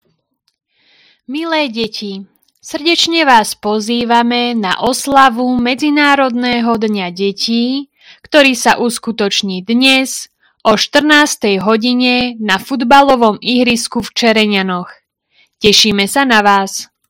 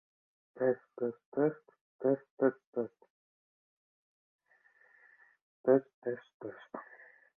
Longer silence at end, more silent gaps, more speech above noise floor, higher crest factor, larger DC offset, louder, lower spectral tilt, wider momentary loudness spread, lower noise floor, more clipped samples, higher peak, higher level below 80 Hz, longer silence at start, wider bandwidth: second, 0.25 s vs 0.55 s; second, none vs 1.25-1.32 s, 1.81-1.99 s, 2.30-2.37 s, 2.67-2.73 s, 3.10-4.39 s, 5.42-5.64 s, 5.94-6.02 s, 6.34-6.40 s; first, 51 dB vs 35 dB; second, 12 dB vs 22 dB; neither; first, -12 LUFS vs -34 LUFS; second, -3 dB/octave vs -10.5 dB/octave; second, 11 LU vs 19 LU; second, -63 dBFS vs -68 dBFS; first, 0.6% vs under 0.1%; first, 0 dBFS vs -14 dBFS; first, -48 dBFS vs -88 dBFS; first, 1.3 s vs 0.55 s; first, over 20 kHz vs 3.6 kHz